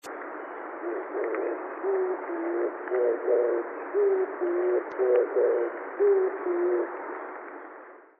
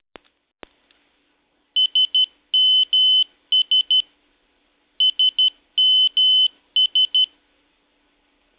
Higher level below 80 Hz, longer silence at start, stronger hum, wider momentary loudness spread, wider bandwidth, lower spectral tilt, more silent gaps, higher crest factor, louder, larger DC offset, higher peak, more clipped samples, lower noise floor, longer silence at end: second, -88 dBFS vs -72 dBFS; second, 0.05 s vs 1.75 s; neither; first, 14 LU vs 5 LU; about the same, 3.8 kHz vs 4 kHz; first, 3.5 dB/octave vs 6.5 dB/octave; neither; first, 16 dB vs 10 dB; second, -28 LUFS vs -15 LUFS; neither; about the same, -12 dBFS vs -12 dBFS; neither; second, -48 dBFS vs -66 dBFS; second, 0.15 s vs 1.35 s